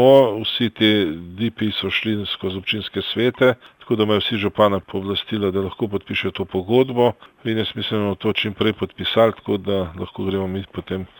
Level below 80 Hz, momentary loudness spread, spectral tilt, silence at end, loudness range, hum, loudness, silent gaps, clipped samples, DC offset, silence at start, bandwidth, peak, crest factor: -54 dBFS; 9 LU; -7 dB/octave; 0.15 s; 1 LU; none; -21 LUFS; none; under 0.1%; under 0.1%; 0 s; 17.5 kHz; -2 dBFS; 18 dB